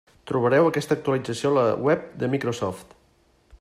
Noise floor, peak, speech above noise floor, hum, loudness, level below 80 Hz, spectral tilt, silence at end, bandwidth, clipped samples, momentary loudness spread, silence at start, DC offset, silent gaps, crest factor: -61 dBFS; -8 dBFS; 39 dB; none; -23 LUFS; -60 dBFS; -6.5 dB/octave; 0.75 s; 13.5 kHz; under 0.1%; 10 LU; 0.25 s; under 0.1%; none; 16 dB